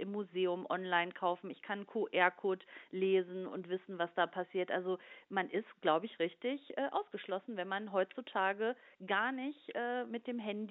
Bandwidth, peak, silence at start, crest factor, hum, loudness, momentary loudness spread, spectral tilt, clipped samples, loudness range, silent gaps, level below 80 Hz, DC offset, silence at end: 4.1 kHz; -14 dBFS; 0 s; 22 dB; none; -37 LUFS; 9 LU; -2.5 dB/octave; under 0.1%; 2 LU; none; under -90 dBFS; under 0.1%; 0 s